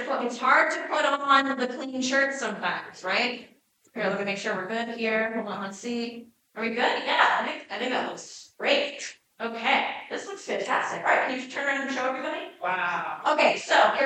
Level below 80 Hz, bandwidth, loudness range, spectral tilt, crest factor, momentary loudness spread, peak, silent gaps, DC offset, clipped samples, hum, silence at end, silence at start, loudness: -82 dBFS; 10.5 kHz; 4 LU; -2.5 dB/octave; 20 dB; 13 LU; -6 dBFS; none; under 0.1%; under 0.1%; none; 0 s; 0 s; -26 LUFS